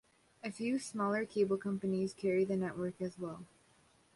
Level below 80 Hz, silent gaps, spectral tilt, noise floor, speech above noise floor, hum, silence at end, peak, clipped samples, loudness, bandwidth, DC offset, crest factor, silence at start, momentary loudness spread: -74 dBFS; none; -6.5 dB/octave; -69 dBFS; 33 dB; none; 0.7 s; -22 dBFS; under 0.1%; -36 LUFS; 11.5 kHz; under 0.1%; 16 dB; 0.45 s; 12 LU